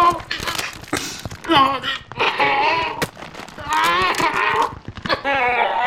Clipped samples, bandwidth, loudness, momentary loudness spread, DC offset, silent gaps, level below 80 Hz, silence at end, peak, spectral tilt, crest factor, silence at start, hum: under 0.1%; 17.5 kHz; -19 LUFS; 12 LU; under 0.1%; none; -46 dBFS; 0 s; -2 dBFS; -3 dB/octave; 18 dB; 0 s; none